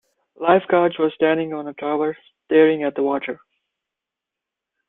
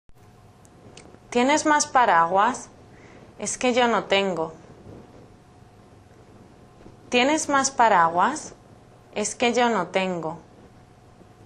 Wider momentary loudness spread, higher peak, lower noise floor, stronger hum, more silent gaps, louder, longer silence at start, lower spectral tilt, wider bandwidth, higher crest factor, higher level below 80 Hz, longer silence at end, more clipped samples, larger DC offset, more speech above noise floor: second, 12 LU vs 16 LU; about the same, -2 dBFS vs -4 dBFS; first, -85 dBFS vs -51 dBFS; neither; neither; about the same, -20 LUFS vs -21 LUFS; first, 0.4 s vs 0.1 s; first, -9.5 dB/octave vs -3 dB/octave; second, 4 kHz vs 12 kHz; about the same, 18 dB vs 20 dB; second, -68 dBFS vs -58 dBFS; first, 1.55 s vs 1.05 s; neither; neither; first, 67 dB vs 30 dB